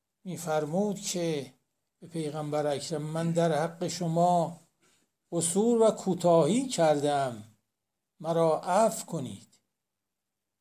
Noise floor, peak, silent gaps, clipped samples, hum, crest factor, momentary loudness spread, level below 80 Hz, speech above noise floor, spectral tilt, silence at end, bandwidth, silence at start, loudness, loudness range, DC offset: -87 dBFS; -12 dBFS; none; under 0.1%; none; 16 dB; 13 LU; -76 dBFS; 59 dB; -5.5 dB/octave; 1.2 s; 16 kHz; 0.25 s; -28 LUFS; 5 LU; under 0.1%